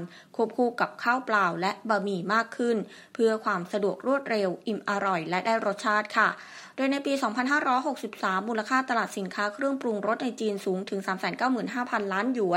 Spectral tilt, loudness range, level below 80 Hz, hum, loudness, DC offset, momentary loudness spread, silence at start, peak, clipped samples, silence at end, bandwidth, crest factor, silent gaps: -5 dB/octave; 2 LU; -82 dBFS; none; -27 LUFS; under 0.1%; 6 LU; 0 s; -8 dBFS; under 0.1%; 0 s; 16 kHz; 20 dB; none